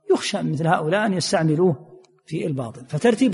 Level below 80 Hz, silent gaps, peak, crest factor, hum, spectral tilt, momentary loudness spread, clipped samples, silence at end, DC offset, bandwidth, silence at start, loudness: -62 dBFS; none; -4 dBFS; 16 dB; none; -5.5 dB/octave; 11 LU; under 0.1%; 0 s; under 0.1%; 11.5 kHz; 0.1 s; -22 LUFS